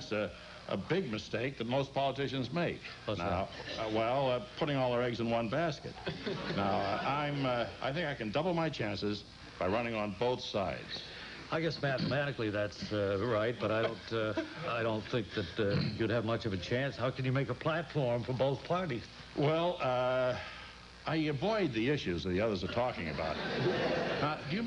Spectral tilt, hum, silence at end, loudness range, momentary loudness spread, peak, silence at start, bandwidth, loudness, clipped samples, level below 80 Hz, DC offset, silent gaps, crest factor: -6.5 dB/octave; none; 0 s; 2 LU; 7 LU; -20 dBFS; 0 s; 10.5 kHz; -34 LUFS; under 0.1%; -58 dBFS; under 0.1%; none; 14 dB